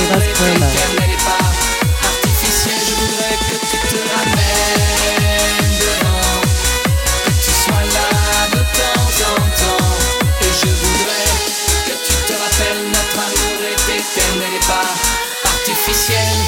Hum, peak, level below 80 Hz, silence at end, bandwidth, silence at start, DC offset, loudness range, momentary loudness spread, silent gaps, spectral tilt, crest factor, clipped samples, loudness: none; 0 dBFS; -22 dBFS; 0 s; 17 kHz; 0 s; under 0.1%; 1 LU; 3 LU; none; -3 dB/octave; 14 dB; under 0.1%; -14 LUFS